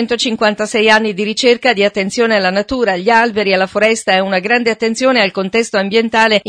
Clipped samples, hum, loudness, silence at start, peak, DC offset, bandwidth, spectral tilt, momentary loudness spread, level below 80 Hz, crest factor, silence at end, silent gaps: under 0.1%; none; -13 LUFS; 0 s; 0 dBFS; under 0.1%; 10.5 kHz; -3.5 dB/octave; 4 LU; -50 dBFS; 14 dB; 0 s; none